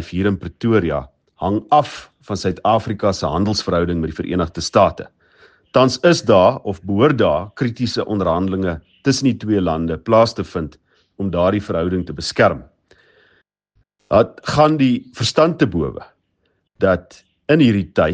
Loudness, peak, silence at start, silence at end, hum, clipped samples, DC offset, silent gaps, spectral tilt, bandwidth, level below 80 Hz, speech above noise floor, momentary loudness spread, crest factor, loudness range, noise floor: -18 LUFS; 0 dBFS; 0 s; 0 s; none; under 0.1%; under 0.1%; none; -6 dB/octave; 9.8 kHz; -46 dBFS; 50 dB; 11 LU; 18 dB; 3 LU; -67 dBFS